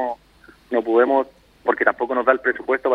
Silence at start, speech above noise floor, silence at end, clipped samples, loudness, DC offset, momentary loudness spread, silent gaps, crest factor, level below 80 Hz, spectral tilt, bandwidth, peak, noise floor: 0 s; 32 dB; 0 s; under 0.1%; -20 LUFS; under 0.1%; 10 LU; none; 20 dB; -60 dBFS; -6 dB/octave; 5.4 kHz; 0 dBFS; -51 dBFS